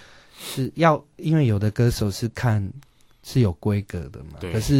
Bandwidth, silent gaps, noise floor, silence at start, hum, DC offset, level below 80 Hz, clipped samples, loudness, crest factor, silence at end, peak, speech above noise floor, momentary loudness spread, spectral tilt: 16.5 kHz; none; -41 dBFS; 0.4 s; none; under 0.1%; -42 dBFS; under 0.1%; -23 LUFS; 18 dB; 0 s; -4 dBFS; 19 dB; 15 LU; -6.5 dB/octave